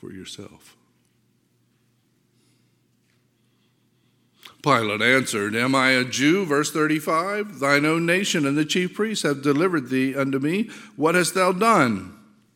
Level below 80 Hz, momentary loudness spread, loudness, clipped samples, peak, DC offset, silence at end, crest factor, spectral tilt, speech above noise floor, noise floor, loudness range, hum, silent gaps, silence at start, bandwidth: -72 dBFS; 9 LU; -21 LUFS; under 0.1%; -2 dBFS; under 0.1%; 0.4 s; 22 dB; -4.5 dB/octave; 44 dB; -65 dBFS; 4 LU; none; none; 0.05 s; 17 kHz